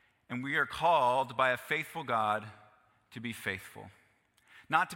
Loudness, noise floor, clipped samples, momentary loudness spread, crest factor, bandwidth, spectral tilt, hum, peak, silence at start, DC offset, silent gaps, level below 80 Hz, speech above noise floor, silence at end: -32 LUFS; -69 dBFS; under 0.1%; 18 LU; 22 dB; 16.5 kHz; -4.5 dB/octave; none; -12 dBFS; 0.3 s; under 0.1%; none; -70 dBFS; 37 dB; 0 s